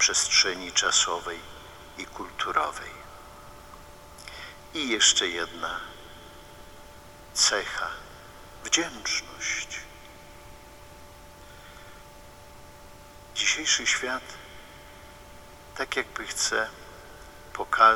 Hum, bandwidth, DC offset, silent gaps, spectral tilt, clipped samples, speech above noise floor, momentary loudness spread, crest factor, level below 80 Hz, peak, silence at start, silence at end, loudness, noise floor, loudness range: none; 20 kHz; under 0.1%; none; 0 dB/octave; under 0.1%; 21 dB; 27 LU; 26 dB; -54 dBFS; -4 dBFS; 0 s; 0 s; -25 LUFS; -48 dBFS; 9 LU